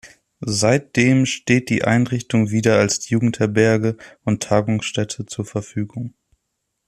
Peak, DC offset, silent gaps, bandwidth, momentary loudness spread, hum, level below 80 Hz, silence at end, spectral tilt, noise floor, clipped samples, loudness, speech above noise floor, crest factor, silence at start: -2 dBFS; under 0.1%; none; 13 kHz; 11 LU; none; -54 dBFS; 0.8 s; -5.5 dB/octave; -75 dBFS; under 0.1%; -19 LUFS; 57 dB; 18 dB; 0.05 s